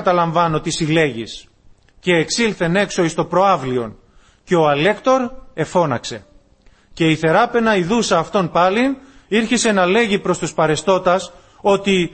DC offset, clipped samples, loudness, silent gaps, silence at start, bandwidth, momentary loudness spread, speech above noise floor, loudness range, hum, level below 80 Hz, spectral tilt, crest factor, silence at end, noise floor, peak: under 0.1%; under 0.1%; -17 LUFS; none; 0 s; 8.8 kHz; 10 LU; 35 dB; 3 LU; none; -46 dBFS; -4.5 dB/octave; 14 dB; 0.05 s; -51 dBFS; -2 dBFS